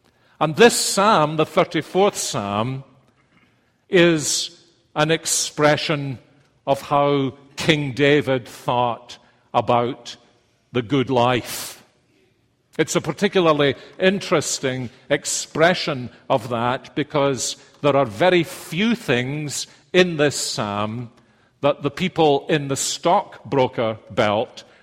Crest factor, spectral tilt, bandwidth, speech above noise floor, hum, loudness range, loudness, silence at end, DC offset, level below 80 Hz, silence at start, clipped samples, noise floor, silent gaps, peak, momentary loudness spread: 20 dB; -4 dB/octave; 16 kHz; 43 dB; none; 3 LU; -20 LUFS; 0.2 s; under 0.1%; -56 dBFS; 0.4 s; under 0.1%; -63 dBFS; none; 0 dBFS; 11 LU